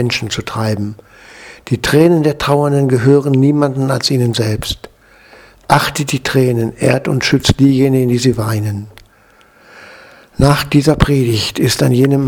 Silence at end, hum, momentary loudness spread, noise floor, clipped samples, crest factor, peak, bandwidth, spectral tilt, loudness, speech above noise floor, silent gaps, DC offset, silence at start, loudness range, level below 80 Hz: 0 s; none; 10 LU; -48 dBFS; 0.1%; 14 dB; 0 dBFS; 19.5 kHz; -6 dB/octave; -13 LUFS; 35 dB; none; under 0.1%; 0 s; 3 LU; -34 dBFS